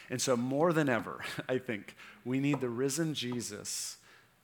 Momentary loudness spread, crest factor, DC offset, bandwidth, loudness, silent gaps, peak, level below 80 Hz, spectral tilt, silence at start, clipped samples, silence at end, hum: 12 LU; 20 dB; under 0.1%; over 20 kHz; -33 LUFS; none; -14 dBFS; -76 dBFS; -4.5 dB/octave; 0 s; under 0.1%; 0.45 s; none